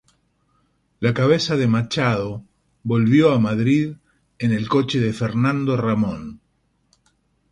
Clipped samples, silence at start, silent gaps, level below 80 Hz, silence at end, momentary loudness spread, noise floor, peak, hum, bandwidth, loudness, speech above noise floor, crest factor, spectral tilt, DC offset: under 0.1%; 1 s; none; -52 dBFS; 1.15 s; 12 LU; -66 dBFS; -4 dBFS; none; 11 kHz; -20 LUFS; 47 dB; 18 dB; -7 dB/octave; under 0.1%